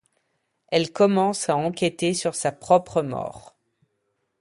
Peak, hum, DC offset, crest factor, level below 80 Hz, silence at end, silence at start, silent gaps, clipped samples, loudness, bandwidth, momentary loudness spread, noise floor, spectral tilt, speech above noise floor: -4 dBFS; none; under 0.1%; 20 dB; -60 dBFS; 1 s; 0.7 s; none; under 0.1%; -23 LUFS; 11.5 kHz; 9 LU; -74 dBFS; -4.5 dB/octave; 52 dB